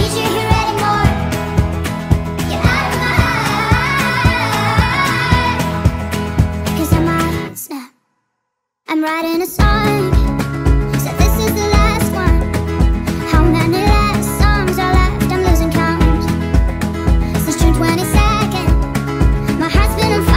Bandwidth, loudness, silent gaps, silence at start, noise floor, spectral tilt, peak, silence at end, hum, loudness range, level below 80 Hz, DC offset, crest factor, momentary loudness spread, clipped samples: 16.5 kHz; -15 LUFS; none; 0 s; -74 dBFS; -5.5 dB/octave; 0 dBFS; 0 s; none; 4 LU; -18 dBFS; under 0.1%; 14 dB; 5 LU; under 0.1%